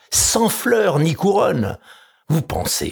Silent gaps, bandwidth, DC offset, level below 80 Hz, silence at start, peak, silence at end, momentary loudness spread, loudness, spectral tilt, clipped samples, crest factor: none; over 20 kHz; under 0.1%; -42 dBFS; 0.1 s; -4 dBFS; 0 s; 8 LU; -18 LUFS; -4 dB/octave; under 0.1%; 14 dB